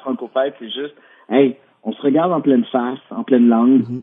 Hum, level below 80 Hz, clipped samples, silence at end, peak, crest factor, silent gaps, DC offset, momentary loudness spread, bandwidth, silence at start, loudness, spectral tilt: none; -78 dBFS; under 0.1%; 0 s; 0 dBFS; 16 dB; none; under 0.1%; 14 LU; 3.8 kHz; 0.05 s; -17 LUFS; -10 dB/octave